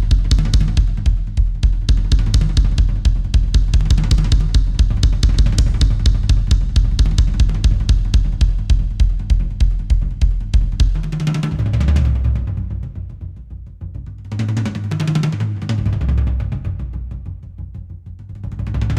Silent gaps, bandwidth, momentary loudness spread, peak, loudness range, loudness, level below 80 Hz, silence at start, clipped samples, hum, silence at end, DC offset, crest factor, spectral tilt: none; 9.8 kHz; 15 LU; -2 dBFS; 6 LU; -18 LUFS; -16 dBFS; 0 s; under 0.1%; none; 0 s; under 0.1%; 14 dB; -6 dB/octave